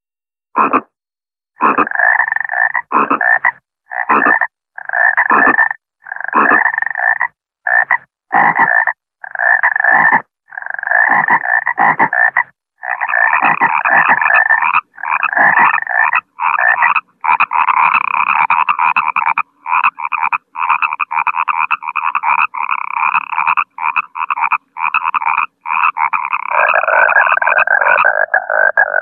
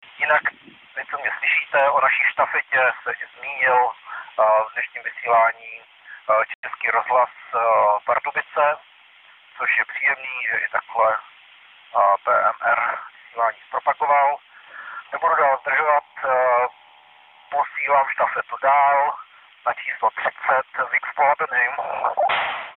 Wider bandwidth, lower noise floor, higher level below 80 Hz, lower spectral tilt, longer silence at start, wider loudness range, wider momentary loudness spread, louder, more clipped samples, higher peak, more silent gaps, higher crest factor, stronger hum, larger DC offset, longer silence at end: about the same, 4.3 kHz vs 4.1 kHz; first, under -90 dBFS vs -51 dBFS; first, -64 dBFS vs -70 dBFS; first, -7 dB/octave vs -5.5 dB/octave; first, 0.55 s vs 0.15 s; about the same, 4 LU vs 2 LU; second, 8 LU vs 11 LU; first, -12 LUFS vs -20 LUFS; neither; first, 0 dBFS vs -4 dBFS; second, none vs 6.55-6.63 s; about the same, 14 dB vs 16 dB; neither; neither; about the same, 0 s vs 0.05 s